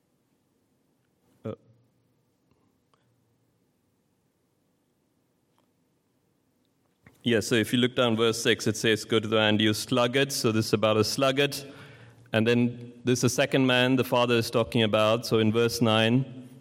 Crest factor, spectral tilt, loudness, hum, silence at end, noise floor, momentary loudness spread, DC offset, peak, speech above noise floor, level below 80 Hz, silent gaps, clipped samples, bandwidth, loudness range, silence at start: 20 dB; -4.5 dB/octave; -24 LUFS; none; 0.05 s; -71 dBFS; 7 LU; under 0.1%; -8 dBFS; 47 dB; -66 dBFS; none; under 0.1%; 16.5 kHz; 5 LU; 1.45 s